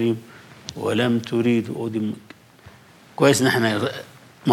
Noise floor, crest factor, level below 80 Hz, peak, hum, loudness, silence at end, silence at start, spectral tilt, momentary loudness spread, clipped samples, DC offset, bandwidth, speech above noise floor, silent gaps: -48 dBFS; 18 dB; -66 dBFS; -4 dBFS; none; -22 LUFS; 0 s; 0 s; -5 dB/octave; 19 LU; under 0.1%; under 0.1%; 16 kHz; 27 dB; none